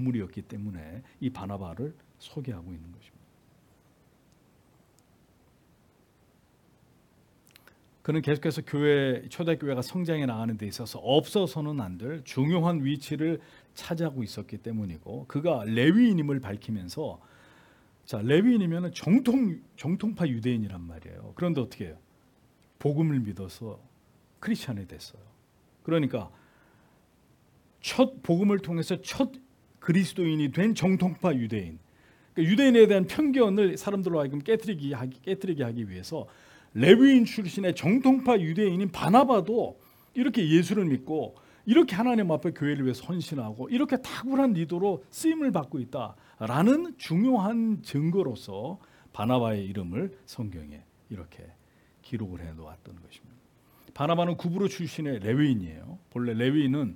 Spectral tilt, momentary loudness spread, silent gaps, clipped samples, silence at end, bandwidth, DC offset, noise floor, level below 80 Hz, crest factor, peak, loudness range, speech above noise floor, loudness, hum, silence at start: -7 dB/octave; 17 LU; none; under 0.1%; 0 s; 18 kHz; under 0.1%; -63 dBFS; -64 dBFS; 26 dB; -2 dBFS; 12 LU; 37 dB; -27 LUFS; none; 0 s